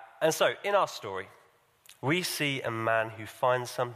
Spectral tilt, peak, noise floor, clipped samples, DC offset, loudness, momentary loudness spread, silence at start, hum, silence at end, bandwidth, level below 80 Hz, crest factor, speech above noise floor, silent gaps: -4 dB/octave; -12 dBFS; -63 dBFS; under 0.1%; under 0.1%; -29 LUFS; 11 LU; 0 s; none; 0 s; 15.5 kHz; -74 dBFS; 18 dB; 33 dB; none